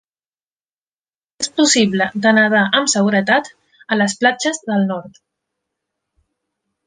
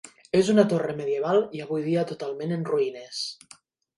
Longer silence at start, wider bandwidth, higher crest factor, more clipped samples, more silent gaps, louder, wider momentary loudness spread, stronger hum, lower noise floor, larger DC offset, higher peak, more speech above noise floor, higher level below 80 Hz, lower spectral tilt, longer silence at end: first, 1.4 s vs 0.05 s; second, 10 kHz vs 11.5 kHz; about the same, 18 dB vs 20 dB; neither; neither; first, -15 LUFS vs -26 LUFS; about the same, 9 LU vs 11 LU; neither; first, under -90 dBFS vs -55 dBFS; neither; first, -2 dBFS vs -6 dBFS; first, over 74 dB vs 30 dB; about the same, -64 dBFS vs -68 dBFS; second, -3.5 dB/octave vs -6 dB/octave; first, 1.75 s vs 0.65 s